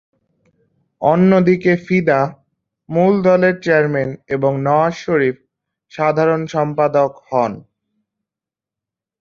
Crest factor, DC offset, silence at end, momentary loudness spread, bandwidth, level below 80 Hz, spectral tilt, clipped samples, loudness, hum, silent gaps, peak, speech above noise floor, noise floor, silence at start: 16 dB; under 0.1%; 1.6 s; 9 LU; 7 kHz; -58 dBFS; -8 dB/octave; under 0.1%; -16 LUFS; none; none; -2 dBFS; 72 dB; -87 dBFS; 1 s